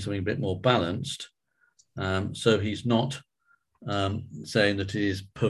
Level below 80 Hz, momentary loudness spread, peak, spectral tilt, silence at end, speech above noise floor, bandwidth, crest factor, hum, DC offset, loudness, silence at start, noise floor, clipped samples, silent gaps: -50 dBFS; 13 LU; -8 dBFS; -5.5 dB/octave; 0 s; 41 dB; 12.5 kHz; 22 dB; none; under 0.1%; -28 LUFS; 0 s; -68 dBFS; under 0.1%; none